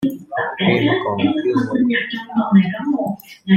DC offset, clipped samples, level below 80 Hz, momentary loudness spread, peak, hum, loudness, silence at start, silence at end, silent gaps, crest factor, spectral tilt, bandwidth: under 0.1%; under 0.1%; -58 dBFS; 8 LU; -2 dBFS; none; -18 LUFS; 0 s; 0 s; none; 16 dB; -7.5 dB/octave; 14 kHz